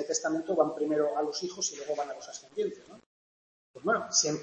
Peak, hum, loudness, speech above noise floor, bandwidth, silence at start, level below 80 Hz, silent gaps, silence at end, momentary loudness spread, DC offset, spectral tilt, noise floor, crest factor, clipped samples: -12 dBFS; none; -31 LUFS; over 59 dB; 8.6 kHz; 0 s; -78 dBFS; 3.06-3.74 s; 0 s; 11 LU; under 0.1%; -2.5 dB/octave; under -90 dBFS; 20 dB; under 0.1%